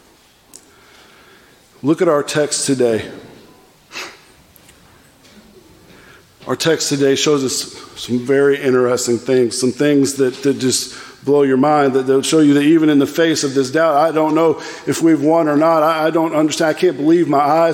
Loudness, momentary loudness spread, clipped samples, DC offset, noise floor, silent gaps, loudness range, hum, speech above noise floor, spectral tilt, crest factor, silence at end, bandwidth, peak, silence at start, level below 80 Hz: -15 LUFS; 10 LU; under 0.1%; under 0.1%; -50 dBFS; none; 8 LU; none; 36 dB; -4.5 dB/octave; 14 dB; 0 s; 17 kHz; -2 dBFS; 1.85 s; -62 dBFS